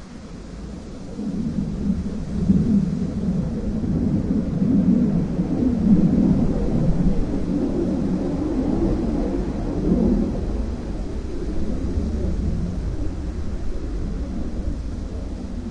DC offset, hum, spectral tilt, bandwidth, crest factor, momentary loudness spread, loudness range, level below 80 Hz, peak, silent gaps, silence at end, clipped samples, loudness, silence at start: under 0.1%; none; -9 dB/octave; 9.6 kHz; 18 dB; 12 LU; 8 LU; -28 dBFS; -4 dBFS; none; 0 s; under 0.1%; -23 LUFS; 0 s